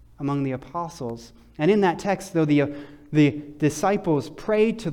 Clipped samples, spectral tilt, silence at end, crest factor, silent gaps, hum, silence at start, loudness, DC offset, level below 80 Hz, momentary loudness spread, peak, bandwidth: under 0.1%; -6.5 dB/octave; 0 s; 16 dB; none; none; 0.2 s; -23 LUFS; under 0.1%; -54 dBFS; 11 LU; -8 dBFS; 15 kHz